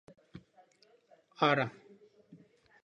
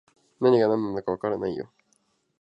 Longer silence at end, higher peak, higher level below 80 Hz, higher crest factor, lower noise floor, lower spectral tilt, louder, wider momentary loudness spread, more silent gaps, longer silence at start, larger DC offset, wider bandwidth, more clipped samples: second, 0.5 s vs 0.75 s; second, -14 dBFS vs -8 dBFS; second, -78 dBFS vs -64 dBFS; about the same, 24 dB vs 20 dB; about the same, -67 dBFS vs -69 dBFS; second, -6 dB/octave vs -8.5 dB/octave; second, -31 LUFS vs -25 LUFS; first, 27 LU vs 14 LU; neither; about the same, 0.35 s vs 0.4 s; neither; first, 9.8 kHz vs 7.8 kHz; neither